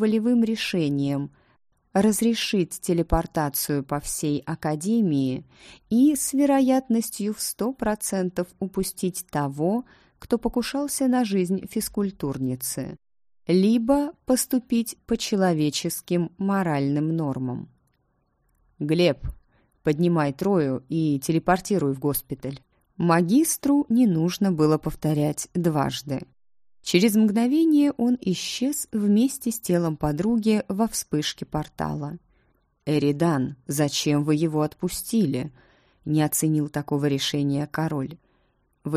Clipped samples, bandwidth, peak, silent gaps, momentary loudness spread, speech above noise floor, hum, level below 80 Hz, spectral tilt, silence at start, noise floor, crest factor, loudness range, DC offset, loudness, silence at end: under 0.1%; 15.5 kHz; -4 dBFS; none; 9 LU; 46 dB; none; -48 dBFS; -5.5 dB/octave; 0 s; -69 dBFS; 20 dB; 4 LU; under 0.1%; -24 LUFS; 0 s